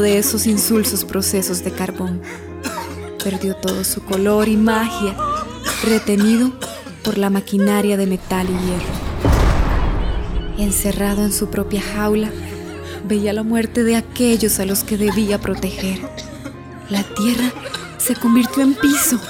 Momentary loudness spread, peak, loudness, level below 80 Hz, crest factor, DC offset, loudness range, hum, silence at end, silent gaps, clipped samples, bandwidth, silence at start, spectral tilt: 13 LU; -2 dBFS; -18 LUFS; -28 dBFS; 16 dB; under 0.1%; 3 LU; none; 0 s; none; under 0.1%; 19.5 kHz; 0 s; -4.5 dB/octave